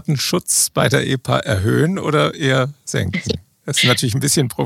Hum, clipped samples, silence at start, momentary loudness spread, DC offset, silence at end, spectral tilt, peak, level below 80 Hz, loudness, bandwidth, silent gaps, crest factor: none; under 0.1%; 0.1 s; 7 LU; under 0.1%; 0 s; -4 dB/octave; 0 dBFS; -48 dBFS; -17 LUFS; 16.5 kHz; none; 16 dB